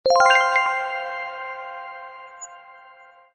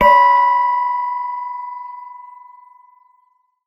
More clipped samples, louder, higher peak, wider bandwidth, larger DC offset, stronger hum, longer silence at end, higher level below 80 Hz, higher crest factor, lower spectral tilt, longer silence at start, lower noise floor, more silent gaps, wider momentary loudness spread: neither; second, -20 LUFS vs -16 LUFS; second, -4 dBFS vs 0 dBFS; second, 9 kHz vs 13 kHz; neither; neither; second, 0.55 s vs 1.35 s; second, -66 dBFS vs -50 dBFS; about the same, 18 dB vs 18 dB; second, 0 dB/octave vs -4.5 dB/octave; about the same, 0.05 s vs 0 s; second, -49 dBFS vs -61 dBFS; neither; about the same, 24 LU vs 24 LU